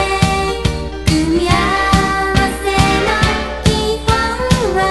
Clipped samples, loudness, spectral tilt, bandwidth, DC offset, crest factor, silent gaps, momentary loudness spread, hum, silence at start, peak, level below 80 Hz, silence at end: under 0.1%; -14 LUFS; -5 dB/octave; 12.5 kHz; under 0.1%; 14 dB; none; 4 LU; none; 0 s; 0 dBFS; -24 dBFS; 0 s